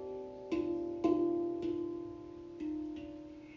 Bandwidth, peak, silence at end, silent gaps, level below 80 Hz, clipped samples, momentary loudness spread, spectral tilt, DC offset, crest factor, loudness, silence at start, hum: 7.2 kHz; -20 dBFS; 0 s; none; -64 dBFS; under 0.1%; 15 LU; -8 dB/octave; under 0.1%; 18 dB; -37 LUFS; 0 s; none